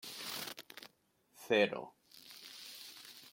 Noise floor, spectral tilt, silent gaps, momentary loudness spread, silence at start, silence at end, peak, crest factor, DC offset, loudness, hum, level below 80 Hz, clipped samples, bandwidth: -73 dBFS; -3 dB/octave; none; 23 LU; 0 s; 0 s; -18 dBFS; 24 dB; under 0.1%; -38 LUFS; none; -86 dBFS; under 0.1%; 16.5 kHz